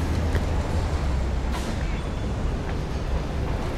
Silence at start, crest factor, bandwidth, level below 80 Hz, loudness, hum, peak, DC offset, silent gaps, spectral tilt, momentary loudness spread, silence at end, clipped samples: 0 s; 14 dB; 13 kHz; -28 dBFS; -28 LUFS; none; -12 dBFS; under 0.1%; none; -6.5 dB/octave; 4 LU; 0 s; under 0.1%